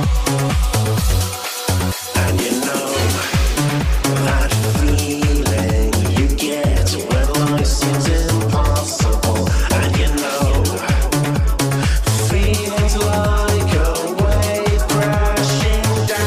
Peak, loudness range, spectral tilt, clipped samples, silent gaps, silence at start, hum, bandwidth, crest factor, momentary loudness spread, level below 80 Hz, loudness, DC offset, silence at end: -4 dBFS; 1 LU; -5 dB/octave; under 0.1%; none; 0 s; none; 15.5 kHz; 12 dB; 2 LU; -20 dBFS; -17 LUFS; under 0.1%; 0 s